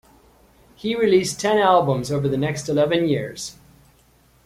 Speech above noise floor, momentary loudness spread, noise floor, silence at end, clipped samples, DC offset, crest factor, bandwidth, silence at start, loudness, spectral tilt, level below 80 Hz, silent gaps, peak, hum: 37 dB; 14 LU; -56 dBFS; 0.95 s; under 0.1%; under 0.1%; 18 dB; 15.5 kHz; 0.85 s; -20 LUFS; -5.5 dB/octave; -54 dBFS; none; -4 dBFS; none